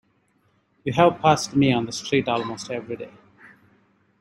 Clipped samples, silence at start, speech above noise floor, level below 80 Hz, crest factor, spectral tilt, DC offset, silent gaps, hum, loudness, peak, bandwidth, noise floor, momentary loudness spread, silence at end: under 0.1%; 0.85 s; 44 dB; -58 dBFS; 20 dB; -5.5 dB/octave; under 0.1%; none; none; -22 LUFS; -4 dBFS; 13 kHz; -65 dBFS; 16 LU; 1.1 s